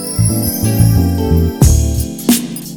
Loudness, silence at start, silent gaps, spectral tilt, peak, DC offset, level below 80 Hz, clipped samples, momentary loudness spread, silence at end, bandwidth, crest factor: -13 LUFS; 0 s; none; -5.5 dB/octave; 0 dBFS; under 0.1%; -20 dBFS; under 0.1%; 4 LU; 0 s; 19.5 kHz; 12 dB